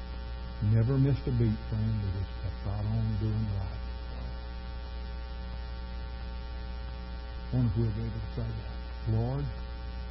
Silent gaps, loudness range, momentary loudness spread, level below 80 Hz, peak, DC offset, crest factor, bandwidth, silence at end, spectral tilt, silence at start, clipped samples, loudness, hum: none; 10 LU; 13 LU; -38 dBFS; -16 dBFS; under 0.1%; 16 dB; 5.8 kHz; 0 s; -11.5 dB/octave; 0 s; under 0.1%; -34 LUFS; none